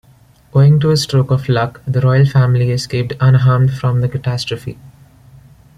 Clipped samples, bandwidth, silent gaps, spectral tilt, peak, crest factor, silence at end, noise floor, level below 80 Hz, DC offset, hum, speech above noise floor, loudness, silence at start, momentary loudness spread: under 0.1%; 12 kHz; none; -7 dB/octave; -2 dBFS; 12 dB; 0.9 s; -47 dBFS; -44 dBFS; under 0.1%; none; 34 dB; -14 LUFS; 0.55 s; 9 LU